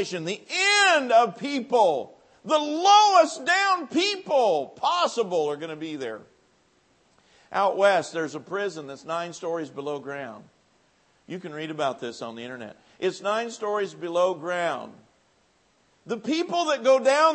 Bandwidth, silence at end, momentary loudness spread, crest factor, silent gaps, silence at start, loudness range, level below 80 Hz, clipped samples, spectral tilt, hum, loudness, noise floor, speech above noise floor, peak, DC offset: 8.8 kHz; 0 s; 18 LU; 20 dB; none; 0 s; 13 LU; -80 dBFS; under 0.1%; -2.5 dB/octave; none; -24 LUFS; -65 dBFS; 40 dB; -6 dBFS; under 0.1%